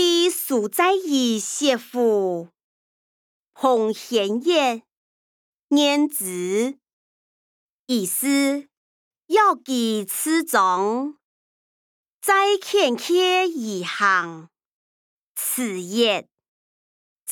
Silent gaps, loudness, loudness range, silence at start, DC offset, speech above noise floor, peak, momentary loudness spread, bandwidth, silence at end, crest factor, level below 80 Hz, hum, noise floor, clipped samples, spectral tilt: 2.64-3.43 s, 4.97-5.68 s, 6.93-7.87 s, 8.77-9.11 s, 11.24-12.21 s, 14.65-15.35 s, 16.48-17.26 s; -21 LUFS; 3 LU; 0 s; under 0.1%; over 69 dB; -6 dBFS; 9 LU; 20 kHz; 0 s; 18 dB; -80 dBFS; none; under -90 dBFS; under 0.1%; -2.5 dB/octave